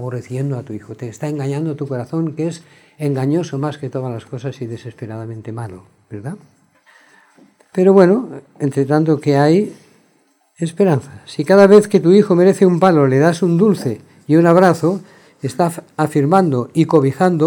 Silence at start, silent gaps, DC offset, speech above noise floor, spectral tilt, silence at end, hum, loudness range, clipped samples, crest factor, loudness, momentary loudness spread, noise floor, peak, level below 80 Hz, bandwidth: 0 s; none; under 0.1%; 43 dB; -7.5 dB/octave; 0 s; none; 14 LU; under 0.1%; 16 dB; -15 LUFS; 19 LU; -58 dBFS; 0 dBFS; -64 dBFS; 17.5 kHz